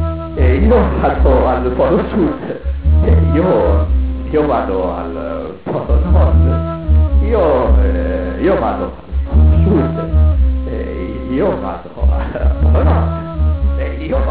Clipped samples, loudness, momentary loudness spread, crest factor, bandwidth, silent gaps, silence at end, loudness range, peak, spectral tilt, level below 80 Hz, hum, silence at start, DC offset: under 0.1%; -15 LUFS; 10 LU; 12 dB; 4 kHz; none; 0 s; 3 LU; 0 dBFS; -12.5 dB/octave; -16 dBFS; none; 0 s; 1%